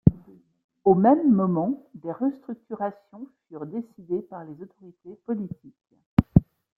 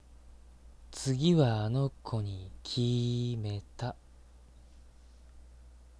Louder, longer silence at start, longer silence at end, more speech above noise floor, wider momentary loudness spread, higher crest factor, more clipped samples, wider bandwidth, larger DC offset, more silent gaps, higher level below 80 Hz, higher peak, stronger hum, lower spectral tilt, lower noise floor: first, -24 LUFS vs -32 LUFS; about the same, 0.05 s vs 0.1 s; first, 0.35 s vs 0.2 s; about the same, 26 dB vs 25 dB; first, 24 LU vs 14 LU; about the same, 24 dB vs 20 dB; neither; second, 4.3 kHz vs 11 kHz; neither; first, 0.64-0.69 s, 6.06-6.17 s vs none; first, -44 dBFS vs -54 dBFS; first, -2 dBFS vs -14 dBFS; neither; first, -12 dB/octave vs -6.5 dB/octave; second, -51 dBFS vs -56 dBFS